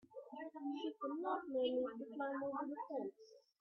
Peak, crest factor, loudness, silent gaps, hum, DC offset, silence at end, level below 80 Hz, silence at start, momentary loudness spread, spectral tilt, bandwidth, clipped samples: -28 dBFS; 16 dB; -44 LUFS; none; none; under 0.1%; 0.2 s; -86 dBFS; 0.1 s; 11 LU; -2.5 dB/octave; 6.4 kHz; under 0.1%